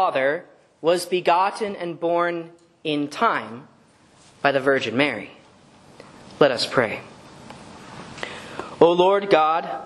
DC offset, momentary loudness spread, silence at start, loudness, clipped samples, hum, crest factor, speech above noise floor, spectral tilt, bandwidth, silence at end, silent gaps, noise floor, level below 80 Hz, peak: under 0.1%; 22 LU; 0 s; -21 LUFS; under 0.1%; none; 22 dB; 33 dB; -4.5 dB/octave; 12.5 kHz; 0 s; none; -54 dBFS; -64 dBFS; 0 dBFS